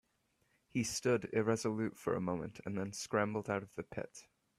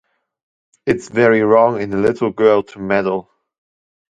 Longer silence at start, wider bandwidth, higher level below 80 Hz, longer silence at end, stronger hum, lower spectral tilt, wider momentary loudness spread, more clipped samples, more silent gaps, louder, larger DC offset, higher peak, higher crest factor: about the same, 0.75 s vs 0.85 s; first, 15 kHz vs 9 kHz; second, -70 dBFS vs -54 dBFS; second, 0.35 s vs 0.9 s; neither; second, -5 dB/octave vs -7 dB/octave; about the same, 11 LU vs 9 LU; neither; neither; second, -38 LUFS vs -16 LUFS; neither; second, -18 dBFS vs 0 dBFS; about the same, 20 dB vs 16 dB